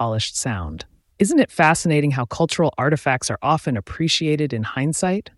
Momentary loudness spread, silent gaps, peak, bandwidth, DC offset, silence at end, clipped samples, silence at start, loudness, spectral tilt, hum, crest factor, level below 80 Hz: 8 LU; none; -4 dBFS; 12 kHz; under 0.1%; 0.15 s; under 0.1%; 0 s; -20 LUFS; -4.5 dB/octave; none; 16 dB; -46 dBFS